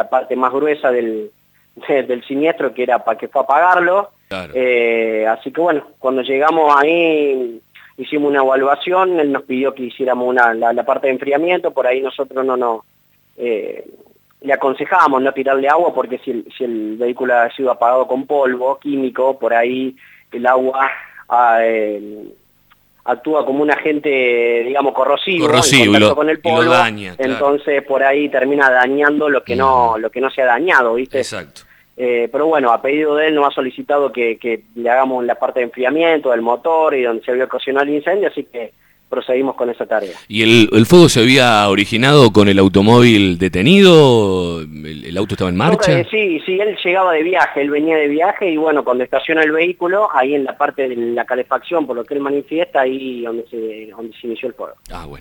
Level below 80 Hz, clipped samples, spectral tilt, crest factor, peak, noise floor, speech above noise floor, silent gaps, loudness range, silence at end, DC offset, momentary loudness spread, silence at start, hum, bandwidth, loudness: -50 dBFS; under 0.1%; -5 dB/octave; 14 dB; 0 dBFS; -53 dBFS; 39 dB; none; 7 LU; 0 s; under 0.1%; 14 LU; 0 s; none; 19 kHz; -14 LUFS